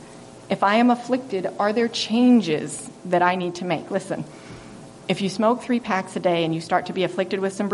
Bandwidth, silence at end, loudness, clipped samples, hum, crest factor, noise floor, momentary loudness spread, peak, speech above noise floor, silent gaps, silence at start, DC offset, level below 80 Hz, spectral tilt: 11.5 kHz; 0 s; -22 LUFS; under 0.1%; none; 18 dB; -42 dBFS; 17 LU; -6 dBFS; 21 dB; none; 0 s; under 0.1%; -64 dBFS; -5 dB/octave